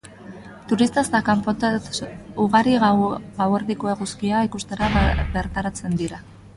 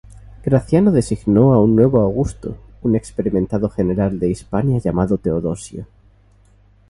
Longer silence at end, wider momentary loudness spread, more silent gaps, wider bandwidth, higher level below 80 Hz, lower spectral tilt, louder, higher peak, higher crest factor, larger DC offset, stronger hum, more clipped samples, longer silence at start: second, 0.1 s vs 1.05 s; about the same, 13 LU vs 13 LU; neither; about the same, 11.5 kHz vs 11.5 kHz; about the same, -34 dBFS vs -38 dBFS; second, -5.5 dB/octave vs -9 dB/octave; second, -22 LUFS vs -17 LUFS; about the same, -4 dBFS vs -2 dBFS; about the same, 18 dB vs 16 dB; neither; second, none vs 50 Hz at -35 dBFS; neither; about the same, 0.05 s vs 0.1 s